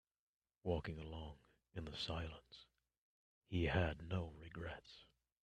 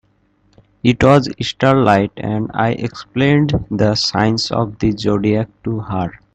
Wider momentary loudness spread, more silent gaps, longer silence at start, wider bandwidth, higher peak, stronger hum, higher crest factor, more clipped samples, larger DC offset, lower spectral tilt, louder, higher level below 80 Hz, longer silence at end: first, 22 LU vs 10 LU; first, 2.98-3.41 s vs none; second, 0.65 s vs 0.85 s; about the same, 9.2 kHz vs 8.6 kHz; second, -22 dBFS vs 0 dBFS; neither; first, 24 dB vs 16 dB; neither; neither; about the same, -6.5 dB/octave vs -6 dB/octave; second, -45 LUFS vs -16 LUFS; second, -60 dBFS vs -40 dBFS; first, 0.4 s vs 0.2 s